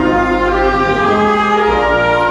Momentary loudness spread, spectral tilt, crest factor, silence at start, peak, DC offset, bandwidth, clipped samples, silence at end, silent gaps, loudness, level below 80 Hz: 1 LU; -6 dB/octave; 10 dB; 0 s; -2 dBFS; under 0.1%; 11.5 kHz; under 0.1%; 0 s; none; -12 LUFS; -28 dBFS